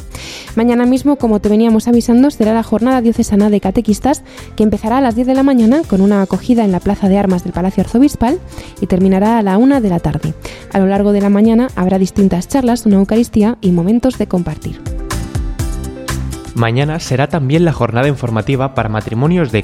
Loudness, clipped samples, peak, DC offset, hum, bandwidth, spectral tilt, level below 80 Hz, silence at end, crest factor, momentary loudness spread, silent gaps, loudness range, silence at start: -13 LUFS; under 0.1%; 0 dBFS; under 0.1%; none; 15 kHz; -7 dB/octave; -30 dBFS; 0 s; 12 dB; 11 LU; none; 4 LU; 0 s